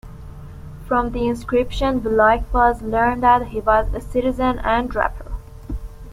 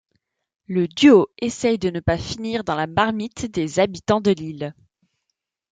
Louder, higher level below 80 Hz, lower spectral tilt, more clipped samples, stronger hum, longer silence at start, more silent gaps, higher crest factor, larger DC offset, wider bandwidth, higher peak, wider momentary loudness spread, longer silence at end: about the same, -19 LUFS vs -20 LUFS; first, -30 dBFS vs -48 dBFS; about the same, -6.5 dB/octave vs -5.5 dB/octave; neither; neither; second, 0.05 s vs 0.7 s; neither; about the same, 18 dB vs 20 dB; neither; first, 15.5 kHz vs 9.4 kHz; about the same, -2 dBFS vs -2 dBFS; first, 20 LU vs 13 LU; second, 0 s vs 1 s